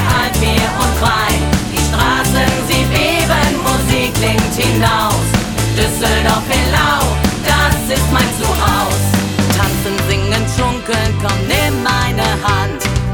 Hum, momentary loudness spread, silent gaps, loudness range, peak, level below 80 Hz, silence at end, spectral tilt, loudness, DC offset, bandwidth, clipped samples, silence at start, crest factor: none; 3 LU; none; 1 LU; 0 dBFS; -22 dBFS; 0 s; -4 dB/octave; -14 LUFS; under 0.1%; over 20 kHz; under 0.1%; 0 s; 14 dB